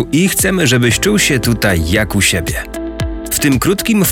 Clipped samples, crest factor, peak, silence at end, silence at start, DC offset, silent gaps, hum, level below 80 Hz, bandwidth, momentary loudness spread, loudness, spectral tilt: under 0.1%; 12 dB; -2 dBFS; 0 s; 0 s; under 0.1%; none; none; -28 dBFS; 18 kHz; 10 LU; -13 LUFS; -4 dB/octave